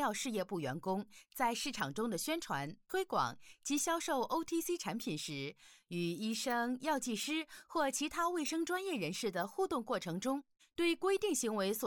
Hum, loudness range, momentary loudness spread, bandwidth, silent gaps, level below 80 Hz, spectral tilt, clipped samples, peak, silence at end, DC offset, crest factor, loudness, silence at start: none; 1 LU; 6 LU; 19 kHz; none; -72 dBFS; -3.5 dB/octave; under 0.1%; -22 dBFS; 0 s; under 0.1%; 16 dB; -37 LUFS; 0 s